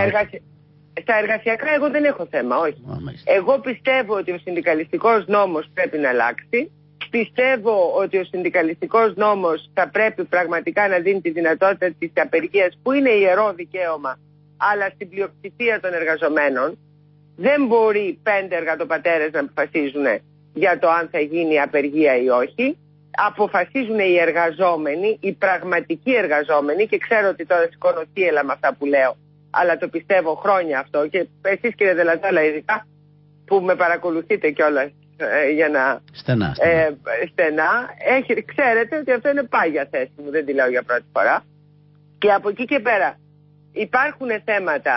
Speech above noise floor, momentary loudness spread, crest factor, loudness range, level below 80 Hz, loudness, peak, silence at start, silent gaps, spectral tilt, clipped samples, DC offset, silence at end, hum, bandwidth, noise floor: 32 dB; 7 LU; 14 dB; 2 LU; -60 dBFS; -19 LUFS; -6 dBFS; 0 s; none; -10.5 dB/octave; under 0.1%; under 0.1%; 0 s; 50 Hz at -50 dBFS; 5.8 kHz; -51 dBFS